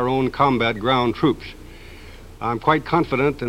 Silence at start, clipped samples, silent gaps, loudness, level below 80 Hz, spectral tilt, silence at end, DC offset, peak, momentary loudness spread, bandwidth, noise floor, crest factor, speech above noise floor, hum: 0 s; under 0.1%; none; -20 LUFS; -42 dBFS; -7 dB/octave; 0 s; under 0.1%; -4 dBFS; 20 LU; 16 kHz; -40 dBFS; 18 dB; 20 dB; none